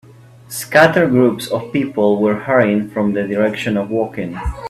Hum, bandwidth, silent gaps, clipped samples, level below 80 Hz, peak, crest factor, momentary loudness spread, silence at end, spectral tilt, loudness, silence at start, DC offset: none; 14.5 kHz; none; under 0.1%; -36 dBFS; 0 dBFS; 16 dB; 11 LU; 0 s; -6 dB/octave; -16 LUFS; 0.5 s; under 0.1%